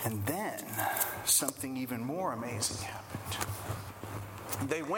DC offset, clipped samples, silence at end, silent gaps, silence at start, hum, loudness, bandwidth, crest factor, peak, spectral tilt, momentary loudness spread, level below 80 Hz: under 0.1%; under 0.1%; 0 s; none; 0 s; none; -34 LUFS; 19 kHz; 26 dB; -10 dBFS; -3 dB/octave; 15 LU; -60 dBFS